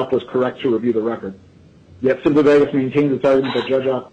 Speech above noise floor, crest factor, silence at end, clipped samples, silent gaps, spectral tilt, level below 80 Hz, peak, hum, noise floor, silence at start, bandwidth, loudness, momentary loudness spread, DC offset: 29 dB; 12 dB; 0.05 s; under 0.1%; none; -7.5 dB/octave; -54 dBFS; -4 dBFS; none; -46 dBFS; 0 s; 8.6 kHz; -17 LUFS; 9 LU; under 0.1%